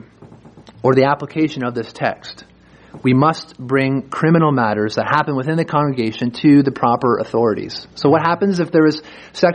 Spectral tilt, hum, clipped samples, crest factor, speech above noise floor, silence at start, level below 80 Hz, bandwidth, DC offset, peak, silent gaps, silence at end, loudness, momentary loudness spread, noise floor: -7.5 dB/octave; none; under 0.1%; 16 dB; 26 dB; 0.2 s; -56 dBFS; 9.6 kHz; under 0.1%; 0 dBFS; none; 0 s; -17 LUFS; 9 LU; -42 dBFS